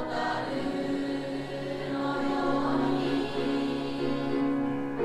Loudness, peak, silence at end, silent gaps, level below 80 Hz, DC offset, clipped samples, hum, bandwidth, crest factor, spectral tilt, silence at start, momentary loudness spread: -30 LUFS; -16 dBFS; 0 s; none; -52 dBFS; under 0.1%; under 0.1%; none; 11 kHz; 14 dB; -6.5 dB/octave; 0 s; 6 LU